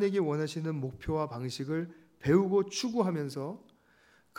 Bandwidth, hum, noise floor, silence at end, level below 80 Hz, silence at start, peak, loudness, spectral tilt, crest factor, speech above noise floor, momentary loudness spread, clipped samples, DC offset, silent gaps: 16 kHz; none; -65 dBFS; 0.8 s; -58 dBFS; 0 s; -12 dBFS; -32 LUFS; -6 dB/octave; 20 dB; 34 dB; 12 LU; under 0.1%; under 0.1%; none